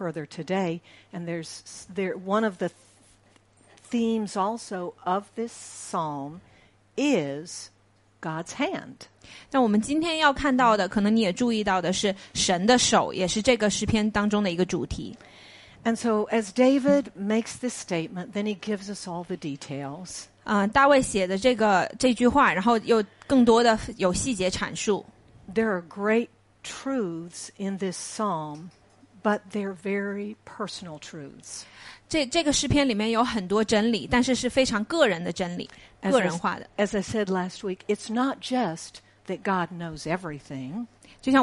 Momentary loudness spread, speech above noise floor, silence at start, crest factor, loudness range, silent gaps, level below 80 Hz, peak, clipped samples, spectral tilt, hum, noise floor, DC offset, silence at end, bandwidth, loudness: 17 LU; 34 dB; 0 s; 20 dB; 9 LU; none; -52 dBFS; -6 dBFS; under 0.1%; -4 dB/octave; none; -59 dBFS; under 0.1%; 0 s; 11.5 kHz; -25 LUFS